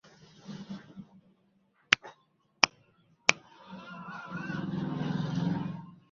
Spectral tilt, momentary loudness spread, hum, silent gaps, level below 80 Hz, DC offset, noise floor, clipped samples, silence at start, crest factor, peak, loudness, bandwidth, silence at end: -2.5 dB/octave; 21 LU; none; none; -68 dBFS; under 0.1%; -70 dBFS; under 0.1%; 0.05 s; 34 dB; 0 dBFS; -30 LUFS; 7.2 kHz; 0.15 s